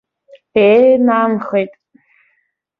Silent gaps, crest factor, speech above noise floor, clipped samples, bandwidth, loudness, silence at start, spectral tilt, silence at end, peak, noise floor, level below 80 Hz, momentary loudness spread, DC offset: none; 14 dB; 53 dB; under 0.1%; 5 kHz; -13 LUFS; 0.55 s; -8.5 dB/octave; 1.1 s; 0 dBFS; -65 dBFS; -58 dBFS; 10 LU; under 0.1%